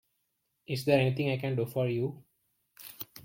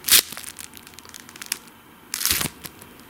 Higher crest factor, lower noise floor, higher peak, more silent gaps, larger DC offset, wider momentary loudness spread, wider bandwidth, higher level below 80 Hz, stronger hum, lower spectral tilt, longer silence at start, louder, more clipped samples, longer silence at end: about the same, 22 dB vs 26 dB; first, -80 dBFS vs -48 dBFS; second, -12 dBFS vs 0 dBFS; neither; neither; second, 17 LU vs 24 LU; about the same, 17 kHz vs 17.5 kHz; second, -70 dBFS vs -54 dBFS; neither; first, -7 dB/octave vs 0.5 dB/octave; first, 0.7 s vs 0.05 s; second, -30 LUFS vs -22 LUFS; neither; second, 0.05 s vs 0.25 s